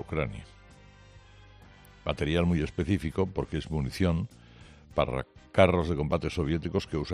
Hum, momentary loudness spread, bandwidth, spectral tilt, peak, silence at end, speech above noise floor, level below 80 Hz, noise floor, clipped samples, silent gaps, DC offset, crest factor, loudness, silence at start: none; 11 LU; 13 kHz; -7 dB/octave; -6 dBFS; 0 s; 25 dB; -46 dBFS; -53 dBFS; under 0.1%; none; under 0.1%; 24 dB; -29 LUFS; 0 s